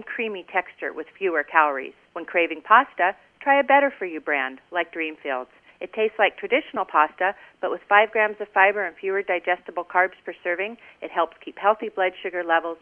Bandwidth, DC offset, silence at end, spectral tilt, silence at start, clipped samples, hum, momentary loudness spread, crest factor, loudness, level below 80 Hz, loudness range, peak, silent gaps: 3.7 kHz; under 0.1%; 0.05 s; -6 dB/octave; 0 s; under 0.1%; none; 13 LU; 22 dB; -23 LUFS; -72 dBFS; 4 LU; 0 dBFS; none